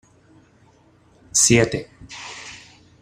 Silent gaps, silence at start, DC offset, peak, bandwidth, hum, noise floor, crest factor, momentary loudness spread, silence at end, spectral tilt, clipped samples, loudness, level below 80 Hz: none; 1.35 s; under 0.1%; -2 dBFS; 14.5 kHz; none; -55 dBFS; 22 dB; 24 LU; 0.45 s; -3 dB/octave; under 0.1%; -17 LUFS; -50 dBFS